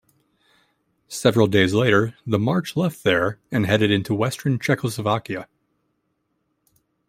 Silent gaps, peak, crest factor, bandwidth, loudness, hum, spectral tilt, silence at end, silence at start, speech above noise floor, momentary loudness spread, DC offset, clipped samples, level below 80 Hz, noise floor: none; -2 dBFS; 20 dB; 16 kHz; -21 LUFS; none; -6 dB/octave; 1.65 s; 1.1 s; 52 dB; 7 LU; under 0.1%; under 0.1%; -58 dBFS; -72 dBFS